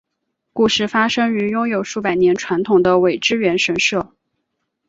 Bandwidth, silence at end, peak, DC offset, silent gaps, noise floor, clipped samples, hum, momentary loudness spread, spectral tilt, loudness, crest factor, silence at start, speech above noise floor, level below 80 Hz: 7.8 kHz; 0.8 s; -2 dBFS; under 0.1%; none; -75 dBFS; under 0.1%; none; 6 LU; -4 dB/octave; -17 LUFS; 16 dB; 0.55 s; 58 dB; -54 dBFS